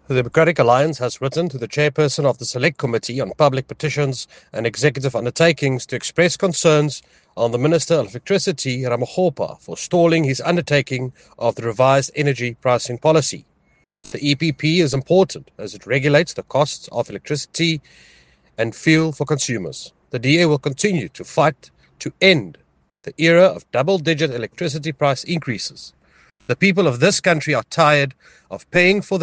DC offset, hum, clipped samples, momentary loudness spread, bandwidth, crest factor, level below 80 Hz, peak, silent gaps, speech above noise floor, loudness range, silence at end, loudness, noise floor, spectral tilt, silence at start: under 0.1%; none; under 0.1%; 12 LU; 10 kHz; 18 dB; -56 dBFS; 0 dBFS; none; 43 dB; 3 LU; 0 s; -18 LUFS; -61 dBFS; -5 dB/octave; 0.1 s